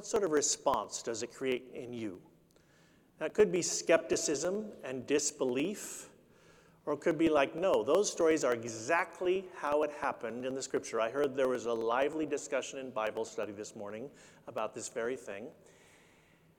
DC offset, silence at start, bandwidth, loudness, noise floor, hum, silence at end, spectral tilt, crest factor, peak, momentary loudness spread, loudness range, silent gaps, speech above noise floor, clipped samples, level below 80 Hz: under 0.1%; 0 s; 18.5 kHz; -33 LUFS; -65 dBFS; none; 1.05 s; -3 dB/octave; 22 dB; -12 dBFS; 15 LU; 7 LU; none; 32 dB; under 0.1%; -70 dBFS